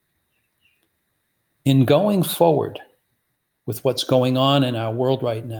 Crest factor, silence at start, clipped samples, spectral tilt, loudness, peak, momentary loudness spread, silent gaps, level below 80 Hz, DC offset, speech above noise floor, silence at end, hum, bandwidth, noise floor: 18 dB; 1.65 s; under 0.1%; -6.5 dB/octave; -19 LUFS; -4 dBFS; 12 LU; none; -62 dBFS; under 0.1%; 54 dB; 0 s; none; over 20 kHz; -73 dBFS